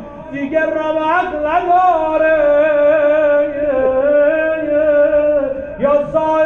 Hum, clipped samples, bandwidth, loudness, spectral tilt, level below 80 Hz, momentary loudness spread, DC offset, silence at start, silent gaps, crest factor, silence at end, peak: none; under 0.1%; 6.4 kHz; -14 LUFS; -7 dB/octave; -42 dBFS; 5 LU; under 0.1%; 0 s; none; 10 dB; 0 s; -4 dBFS